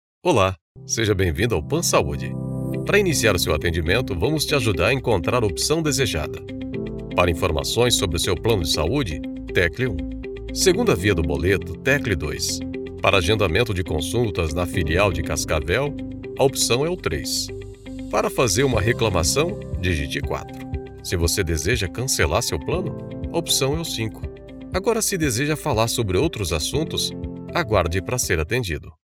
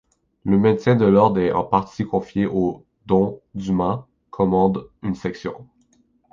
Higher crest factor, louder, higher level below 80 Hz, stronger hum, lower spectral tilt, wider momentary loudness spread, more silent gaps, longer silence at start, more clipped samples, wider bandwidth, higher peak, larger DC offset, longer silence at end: about the same, 20 dB vs 18 dB; about the same, -21 LUFS vs -20 LUFS; first, -36 dBFS vs -48 dBFS; neither; second, -4 dB/octave vs -9 dB/octave; second, 11 LU vs 15 LU; first, 0.61-0.75 s vs none; second, 0.25 s vs 0.45 s; neither; first, 17 kHz vs 7.2 kHz; first, 0 dBFS vs -4 dBFS; neither; second, 0.2 s vs 0.7 s